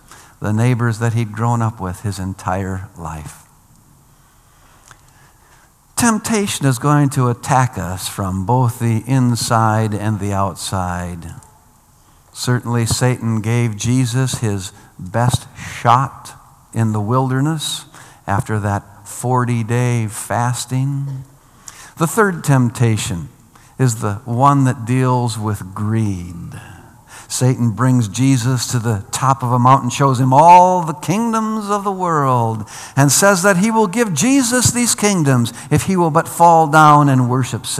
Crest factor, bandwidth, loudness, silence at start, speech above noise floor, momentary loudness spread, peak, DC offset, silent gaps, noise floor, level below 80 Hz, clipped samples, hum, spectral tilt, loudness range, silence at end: 16 dB; 15 kHz; -16 LUFS; 0.1 s; 34 dB; 13 LU; 0 dBFS; under 0.1%; none; -50 dBFS; -50 dBFS; 0.1%; none; -5.5 dB/octave; 8 LU; 0 s